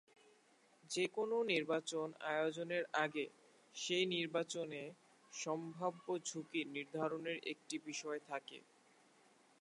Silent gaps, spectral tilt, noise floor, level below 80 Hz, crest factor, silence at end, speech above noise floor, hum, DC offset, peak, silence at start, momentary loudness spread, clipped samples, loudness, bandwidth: none; -3.5 dB/octave; -71 dBFS; under -90 dBFS; 22 dB; 1.05 s; 30 dB; none; under 0.1%; -22 dBFS; 0.85 s; 11 LU; under 0.1%; -41 LUFS; 11.5 kHz